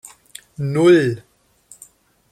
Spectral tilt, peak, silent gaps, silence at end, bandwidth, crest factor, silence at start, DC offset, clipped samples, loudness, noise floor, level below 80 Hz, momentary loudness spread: -6.5 dB/octave; -2 dBFS; none; 1.1 s; 14 kHz; 18 dB; 0.6 s; under 0.1%; under 0.1%; -16 LUFS; -50 dBFS; -60 dBFS; 25 LU